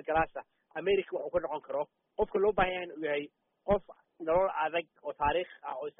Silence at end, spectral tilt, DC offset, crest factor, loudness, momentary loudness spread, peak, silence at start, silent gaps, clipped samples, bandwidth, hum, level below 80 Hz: 0.1 s; -0.5 dB/octave; under 0.1%; 18 dB; -32 LUFS; 12 LU; -14 dBFS; 0.05 s; none; under 0.1%; 3.8 kHz; none; -54 dBFS